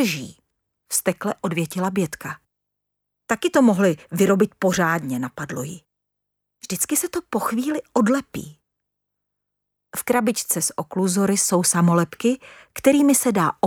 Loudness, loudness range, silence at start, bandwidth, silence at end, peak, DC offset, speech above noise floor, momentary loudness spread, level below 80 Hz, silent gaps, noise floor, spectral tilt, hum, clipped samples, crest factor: -21 LUFS; 6 LU; 0 s; 18.5 kHz; 0 s; -4 dBFS; under 0.1%; 59 dB; 14 LU; -60 dBFS; none; -80 dBFS; -4.5 dB/octave; 50 Hz at -50 dBFS; under 0.1%; 18 dB